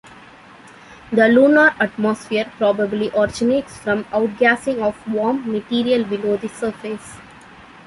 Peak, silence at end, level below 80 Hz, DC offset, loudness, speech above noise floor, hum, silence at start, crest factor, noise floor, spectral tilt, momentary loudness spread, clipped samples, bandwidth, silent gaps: -2 dBFS; 0.25 s; -54 dBFS; under 0.1%; -18 LUFS; 25 dB; none; 0.1 s; 18 dB; -43 dBFS; -5.5 dB/octave; 12 LU; under 0.1%; 11.5 kHz; none